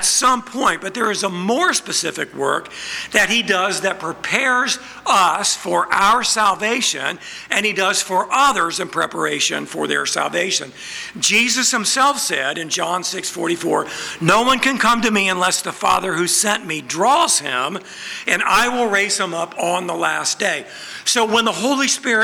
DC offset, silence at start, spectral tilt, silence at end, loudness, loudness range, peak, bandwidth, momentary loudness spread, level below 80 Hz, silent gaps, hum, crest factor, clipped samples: under 0.1%; 0 s; -1.5 dB/octave; 0 s; -17 LUFS; 2 LU; 0 dBFS; over 20 kHz; 8 LU; -54 dBFS; none; none; 18 dB; under 0.1%